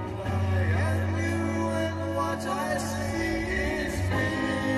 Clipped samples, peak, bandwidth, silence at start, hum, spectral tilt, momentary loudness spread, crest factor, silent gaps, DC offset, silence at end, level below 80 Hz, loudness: under 0.1%; -16 dBFS; 13 kHz; 0 s; none; -6 dB/octave; 3 LU; 12 dB; none; under 0.1%; 0 s; -42 dBFS; -28 LUFS